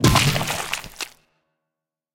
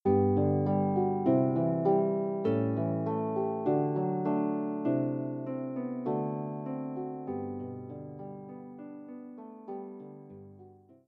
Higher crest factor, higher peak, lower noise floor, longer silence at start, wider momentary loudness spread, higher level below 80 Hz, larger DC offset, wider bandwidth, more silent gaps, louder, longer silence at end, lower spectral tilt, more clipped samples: about the same, 22 dB vs 18 dB; first, -2 dBFS vs -14 dBFS; first, -85 dBFS vs -55 dBFS; about the same, 0 s vs 0.05 s; about the same, 16 LU vs 18 LU; first, -38 dBFS vs -74 dBFS; neither; first, 17 kHz vs 4.3 kHz; neither; first, -22 LUFS vs -31 LUFS; first, 1.05 s vs 0.35 s; second, -4 dB/octave vs -10.5 dB/octave; neither